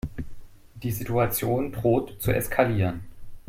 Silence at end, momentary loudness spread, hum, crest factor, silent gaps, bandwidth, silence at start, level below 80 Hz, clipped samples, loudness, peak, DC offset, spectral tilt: 0.1 s; 14 LU; none; 20 dB; none; 16.5 kHz; 0.05 s; -42 dBFS; under 0.1%; -26 LUFS; -6 dBFS; under 0.1%; -6.5 dB/octave